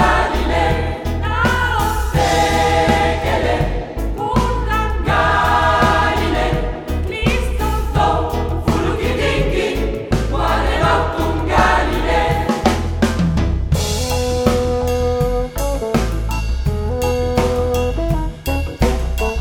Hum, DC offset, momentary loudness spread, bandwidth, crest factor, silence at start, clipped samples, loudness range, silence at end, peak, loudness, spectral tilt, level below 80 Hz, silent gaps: none; under 0.1%; 7 LU; 18.5 kHz; 16 dB; 0 s; under 0.1%; 3 LU; 0 s; 0 dBFS; -17 LUFS; -5.5 dB/octave; -22 dBFS; none